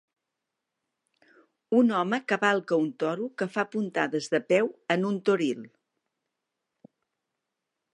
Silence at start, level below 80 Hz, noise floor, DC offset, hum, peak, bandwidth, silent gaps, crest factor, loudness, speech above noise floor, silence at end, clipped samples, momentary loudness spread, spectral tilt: 1.7 s; -82 dBFS; -85 dBFS; under 0.1%; none; -8 dBFS; 10.5 kHz; none; 22 dB; -27 LUFS; 59 dB; 2.25 s; under 0.1%; 7 LU; -5.5 dB/octave